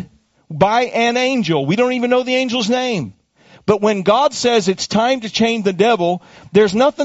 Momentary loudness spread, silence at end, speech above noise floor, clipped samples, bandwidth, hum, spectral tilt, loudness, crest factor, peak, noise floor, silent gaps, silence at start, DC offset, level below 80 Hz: 6 LU; 0 s; 34 dB; under 0.1%; 8 kHz; none; -3.5 dB/octave; -16 LUFS; 16 dB; 0 dBFS; -49 dBFS; none; 0 s; under 0.1%; -54 dBFS